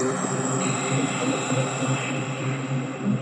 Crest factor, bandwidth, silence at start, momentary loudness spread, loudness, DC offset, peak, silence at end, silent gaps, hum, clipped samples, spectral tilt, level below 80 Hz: 14 dB; 11 kHz; 0 s; 4 LU; -25 LUFS; under 0.1%; -12 dBFS; 0 s; none; none; under 0.1%; -4.5 dB/octave; -68 dBFS